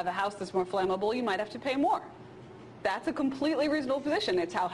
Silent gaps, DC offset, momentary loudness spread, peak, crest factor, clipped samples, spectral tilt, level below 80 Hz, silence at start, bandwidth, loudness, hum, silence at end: none; under 0.1%; 15 LU; -16 dBFS; 14 dB; under 0.1%; -5 dB/octave; -64 dBFS; 0 s; 12 kHz; -30 LUFS; none; 0 s